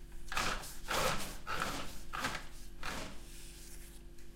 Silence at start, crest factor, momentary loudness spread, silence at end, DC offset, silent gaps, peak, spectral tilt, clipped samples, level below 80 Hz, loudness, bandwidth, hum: 0 s; 20 dB; 17 LU; 0 s; under 0.1%; none; -20 dBFS; -2.5 dB/octave; under 0.1%; -48 dBFS; -39 LUFS; 16 kHz; none